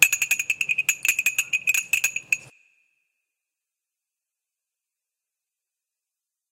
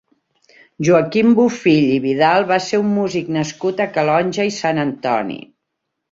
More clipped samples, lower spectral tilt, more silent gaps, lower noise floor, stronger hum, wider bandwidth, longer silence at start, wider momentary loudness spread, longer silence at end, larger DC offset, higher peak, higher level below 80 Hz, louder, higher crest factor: neither; second, 3 dB/octave vs -6 dB/octave; neither; first, -87 dBFS vs -76 dBFS; neither; first, 17 kHz vs 7.8 kHz; second, 0 s vs 0.8 s; second, 4 LU vs 8 LU; first, 4.05 s vs 0.7 s; neither; about the same, 0 dBFS vs -2 dBFS; second, -74 dBFS vs -60 dBFS; second, -22 LUFS vs -16 LUFS; first, 28 dB vs 16 dB